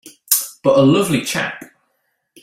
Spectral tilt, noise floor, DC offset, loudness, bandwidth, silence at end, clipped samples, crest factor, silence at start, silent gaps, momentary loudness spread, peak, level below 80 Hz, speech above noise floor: -4 dB/octave; -69 dBFS; under 0.1%; -16 LUFS; 16.5 kHz; 0.75 s; under 0.1%; 18 dB; 0.05 s; none; 11 LU; 0 dBFS; -56 dBFS; 54 dB